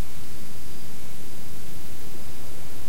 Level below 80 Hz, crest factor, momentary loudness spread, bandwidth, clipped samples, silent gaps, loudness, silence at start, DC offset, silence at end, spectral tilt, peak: -50 dBFS; 14 dB; 1 LU; 16.5 kHz; under 0.1%; none; -41 LUFS; 0 s; 20%; 0 s; -4.5 dB/octave; -12 dBFS